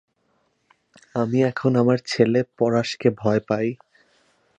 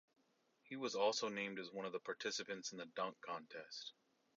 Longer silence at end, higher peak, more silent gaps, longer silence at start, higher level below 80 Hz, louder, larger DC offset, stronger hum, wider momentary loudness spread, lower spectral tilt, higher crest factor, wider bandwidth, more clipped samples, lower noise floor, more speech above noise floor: first, 0.85 s vs 0.45 s; first, -4 dBFS vs -26 dBFS; neither; first, 1.15 s vs 0.65 s; first, -62 dBFS vs under -90 dBFS; first, -22 LUFS vs -45 LUFS; neither; neither; second, 7 LU vs 13 LU; first, -7 dB/octave vs -1.5 dB/octave; about the same, 20 dB vs 20 dB; first, 9 kHz vs 7.4 kHz; neither; second, -68 dBFS vs -79 dBFS; first, 47 dB vs 34 dB